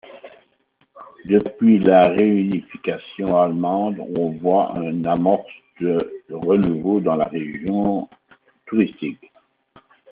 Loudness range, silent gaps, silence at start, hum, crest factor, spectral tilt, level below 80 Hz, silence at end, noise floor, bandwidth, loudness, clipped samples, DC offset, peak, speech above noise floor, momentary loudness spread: 4 LU; none; 0.1 s; none; 18 dB; -7 dB/octave; -56 dBFS; 0.95 s; -64 dBFS; 4.1 kHz; -20 LUFS; under 0.1%; under 0.1%; -2 dBFS; 45 dB; 12 LU